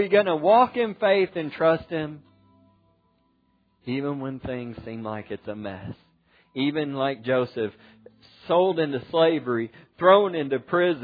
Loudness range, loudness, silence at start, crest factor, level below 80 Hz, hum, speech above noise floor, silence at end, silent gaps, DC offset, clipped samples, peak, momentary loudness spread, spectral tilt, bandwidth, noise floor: 11 LU; -24 LUFS; 0 s; 22 dB; -62 dBFS; none; 43 dB; 0 s; none; under 0.1%; under 0.1%; -4 dBFS; 17 LU; -9 dB/octave; 5 kHz; -67 dBFS